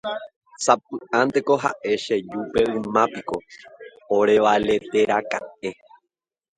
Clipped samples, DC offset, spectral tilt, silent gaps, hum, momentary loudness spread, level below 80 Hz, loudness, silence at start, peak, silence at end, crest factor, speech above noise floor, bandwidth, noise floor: under 0.1%; under 0.1%; -4 dB/octave; 0.36-0.41 s; none; 14 LU; -56 dBFS; -22 LUFS; 0.05 s; -2 dBFS; 0.85 s; 22 dB; 61 dB; 9.6 kHz; -82 dBFS